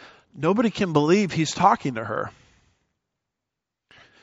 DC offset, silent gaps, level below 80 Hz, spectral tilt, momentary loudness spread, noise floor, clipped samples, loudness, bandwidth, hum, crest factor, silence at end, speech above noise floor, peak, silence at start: under 0.1%; none; -60 dBFS; -5 dB/octave; 10 LU; -85 dBFS; under 0.1%; -22 LUFS; 8 kHz; none; 22 dB; 1.95 s; 63 dB; -4 dBFS; 0 s